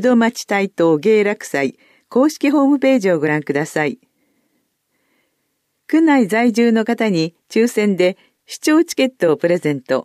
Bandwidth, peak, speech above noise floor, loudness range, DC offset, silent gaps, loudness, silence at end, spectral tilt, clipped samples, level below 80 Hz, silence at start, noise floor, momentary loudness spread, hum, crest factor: 14.5 kHz; -4 dBFS; 54 dB; 4 LU; under 0.1%; none; -16 LUFS; 0.05 s; -5.5 dB/octave; under 0.1%; -70 dBFS; 0 s; -70 dBFS; 7 LU; none; 12 dB